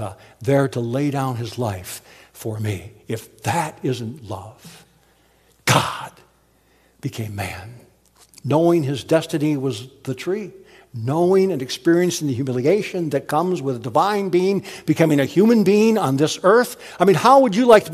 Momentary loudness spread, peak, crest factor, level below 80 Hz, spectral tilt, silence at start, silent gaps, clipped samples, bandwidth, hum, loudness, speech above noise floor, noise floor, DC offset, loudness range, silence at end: 17 LU; 0 dBFS; 20 dB; -60 dBFS; -6 dB/octave; 0 s; none; under 0.1%; 15 kHz; none; -19 LUFS; 39 dB; -58 dBFS; under 0.1%; 9 LU; 0 s